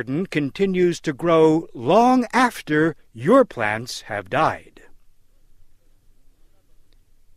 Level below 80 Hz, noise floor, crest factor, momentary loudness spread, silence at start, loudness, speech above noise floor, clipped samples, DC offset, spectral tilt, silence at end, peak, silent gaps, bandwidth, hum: -52 dBFS; -52 dBFS; 18 dB; 10 LU; 0 s; -20 LUFS; 33 dB; under 0.1%; under 0.1%; -6 dB/octave; 2.4 s; -4 dBFS; none; 15.5 kHz; none